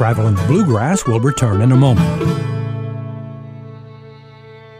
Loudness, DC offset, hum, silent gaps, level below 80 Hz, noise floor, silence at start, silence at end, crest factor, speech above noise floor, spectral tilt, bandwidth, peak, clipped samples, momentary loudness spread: -15 LUFS; under 0.1%; none; none; -40 dBFS; -38 dBFS; 0 s; 0 s; 14 dB; 25 dB; -7 dB/octave; 14 kHz; -2 dBFS; under 0.1%; 21 LU